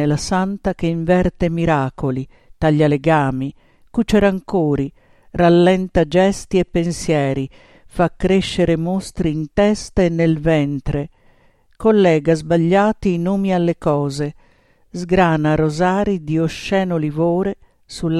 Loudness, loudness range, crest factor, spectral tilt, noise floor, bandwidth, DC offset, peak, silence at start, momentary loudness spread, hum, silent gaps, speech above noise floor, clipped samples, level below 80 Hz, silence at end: -18 LUFS; 2 LU; 16 dB; -7 dB/octave; -54 dBFS; 12 kHz; under 0.1%; 0 dBFS; 0 s; 11 LU; none; none; 37 dB; under 0.1%; -36 dBFS; 0 s